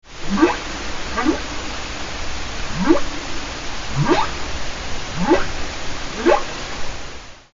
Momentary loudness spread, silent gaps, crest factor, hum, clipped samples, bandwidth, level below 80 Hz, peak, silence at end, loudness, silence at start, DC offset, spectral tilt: 10 LU; none; 20 dB; none; under 0.1%; 7.8 kHz; -32 dBFS; 0 dBFS; 0.15 s; -22 LUFS; 0.05 s; under 0.1%; -4 dB/octave